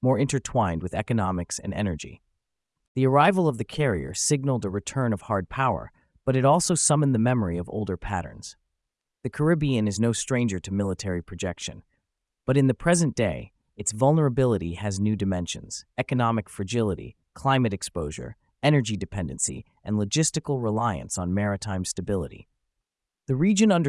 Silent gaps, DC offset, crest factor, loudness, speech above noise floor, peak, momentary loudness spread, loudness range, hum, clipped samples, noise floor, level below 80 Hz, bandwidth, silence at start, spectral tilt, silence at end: 2.88-2.95 s; under 0.1%; 18 dB; -25 LUFS; 60 dB; -6 dBFS; 13 LU; 3 LU; none; under 0.1%; -84 dBFS; -50 dBFS; 12 kHz; 0 s; -5.5 dB/octave; 0 s